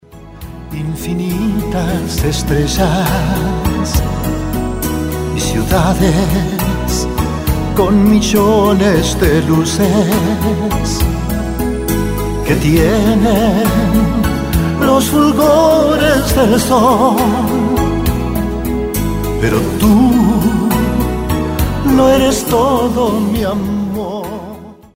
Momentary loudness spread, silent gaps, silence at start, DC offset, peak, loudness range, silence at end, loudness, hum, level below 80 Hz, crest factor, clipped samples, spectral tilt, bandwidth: 8 LU; none; 0.15 s; under 0.1%; 0 dBFS; 4 LU; 0.2 s; -13 LUFS; none; -22 dBFS; 12 dB; under 0.1%; -6 dB/octave; 16.5 kHz